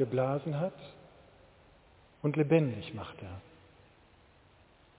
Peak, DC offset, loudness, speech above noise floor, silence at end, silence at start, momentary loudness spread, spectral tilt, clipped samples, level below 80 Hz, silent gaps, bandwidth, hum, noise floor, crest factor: -12 dBFS; under 0.1%; -32 LUFS; 30 dB; 1.6 s; 0 s; 22 LU; -7.5 dB/octave; under 0.1%; -64 dBFS; none; 4 kHz; none; -62 dBFS; 22 dB